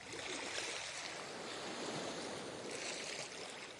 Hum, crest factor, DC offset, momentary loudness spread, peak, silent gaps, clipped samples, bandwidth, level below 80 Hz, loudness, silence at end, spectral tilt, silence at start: none; 20 dB; under 0.1%; 5 LU; -26 dBFS; none; under 0.1%; 11.5 kHz; -78 dBFS; -43 LUFS; 0 s; -1.5 dB/octave; 0 s